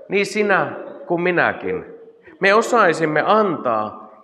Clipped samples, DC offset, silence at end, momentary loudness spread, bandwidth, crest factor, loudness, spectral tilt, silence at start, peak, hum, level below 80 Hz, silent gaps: under 0.1%; under 0.1%; 0.15 s; 12 LU; 13 kHz; 16 dB; -18 LUFS; -5 dB/octave; 0.1 s; -2 dBFS; none; -70 dBFS; none